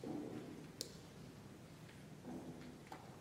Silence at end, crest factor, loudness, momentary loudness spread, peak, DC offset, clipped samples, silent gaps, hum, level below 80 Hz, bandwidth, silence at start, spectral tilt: 0 s; 30 dB; -53 LUFS; 9 LU; -22 dBFS; under 0.1%; under 0.1%; none; none; -74 dBFS; 16 kHz; 0 s; -5 dB/octave